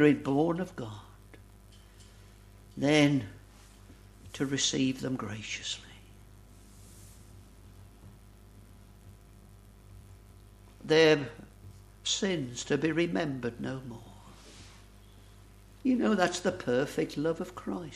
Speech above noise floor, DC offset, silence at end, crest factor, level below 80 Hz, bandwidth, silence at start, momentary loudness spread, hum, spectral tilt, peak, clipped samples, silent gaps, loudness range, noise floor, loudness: 25 dB; under 0.1%; 0 s; 22 dB; -56 dBFS; 14 kHz; 0 s; 27 LU; 50 Hz at -55 dBFS; -4.5 dB/octave; -10 dBFS; under 0.1%; none; 7 LU; -54 dBFS; -30 LUFS